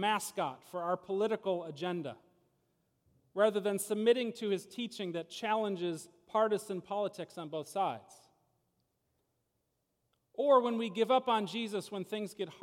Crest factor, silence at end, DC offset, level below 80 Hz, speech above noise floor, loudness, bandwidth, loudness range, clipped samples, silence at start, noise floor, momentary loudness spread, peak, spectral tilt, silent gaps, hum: 20 dB; 0.05 s; under 0.1%; -86 dBFS; 48 dB; -34 LUFS; 17 kHz; 7 LU; under 0.1%; 0 s; -82 dBFS; 12 LU; -14 dBFS; -4.5 dB/octave; none; none